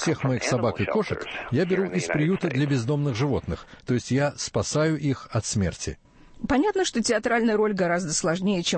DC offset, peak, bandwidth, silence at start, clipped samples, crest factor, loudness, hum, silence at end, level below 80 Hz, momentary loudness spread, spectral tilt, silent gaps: under 0.1%; -10 dBFS; 8.8 kHz; 0 s; under 0.1%; 14 dB; -25 LUFS; none; 0 s; -48 dBFS; 6 LU; -5 dB/octave; none